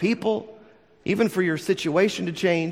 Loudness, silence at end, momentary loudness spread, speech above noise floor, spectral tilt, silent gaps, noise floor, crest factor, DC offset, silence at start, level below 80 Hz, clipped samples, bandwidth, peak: -24 LUFS; 0 s; 6 LU; 29 dB; -5.5 dB/octave; none; -52 dBFS; 16 dB; under 0.1%; 0 s; -64 dBFS; under 0.1%; 16 kHz; -8 dBFS